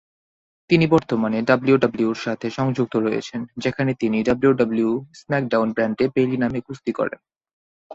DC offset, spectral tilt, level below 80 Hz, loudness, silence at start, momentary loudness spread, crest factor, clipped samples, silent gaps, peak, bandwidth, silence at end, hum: under 0.1%; -7.5 dB/octave; -56 dBFS; -21 LUFS; 0.7 s; 9 LU; 20 dB; under 0.1%; 7.53-7.90 s; -2 dBFS; 7.8 kHz; 0 s; none